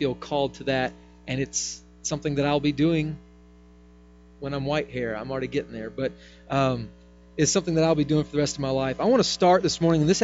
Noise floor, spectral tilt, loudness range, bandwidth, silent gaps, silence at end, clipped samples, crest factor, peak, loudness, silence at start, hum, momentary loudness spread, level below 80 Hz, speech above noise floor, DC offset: -51 dBFS; -5 dB/octave; 7 LU; 8 kHz; none; 0 s; under 0.1%; 18 dB; -8 dBFS; -25 LUFS; 0 s; 60 Hz at -45 dBFS; 12 LU; -50 dBFS; 27 dB; under 0.1%